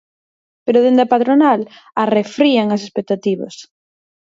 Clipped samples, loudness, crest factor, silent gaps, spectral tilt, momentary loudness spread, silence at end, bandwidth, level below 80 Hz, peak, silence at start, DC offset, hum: under 0.1%; -15 LUFS; 16 dB; none; -6 dB/octave; 12 LU; 0.7 s; 7.8 kHz; -68 dBFS; 0 dBFS; 0.65 s; under 0.1%; none